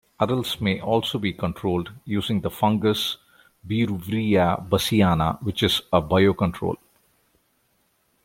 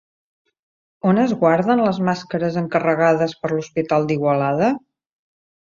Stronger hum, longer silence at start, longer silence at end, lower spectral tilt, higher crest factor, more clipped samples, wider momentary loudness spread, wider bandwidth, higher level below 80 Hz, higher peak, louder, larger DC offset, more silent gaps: neither; second, 0.2 s vs 1.05 s; first, 1.5 s vs 0.95 s; second, -6 dB/octave vs -7.5 dB/octave; about the same, 20 dB vs 18 dB; neither; first, 9 LU vs 6 LU; first, 16.5 kHz vs 7.4 kHz; first, -50 dBFS vs -60 dBFS; about the same, -2 dBFS vs -2 dBFS; second, -23 LUFS vs -19 LUFS; neither; neither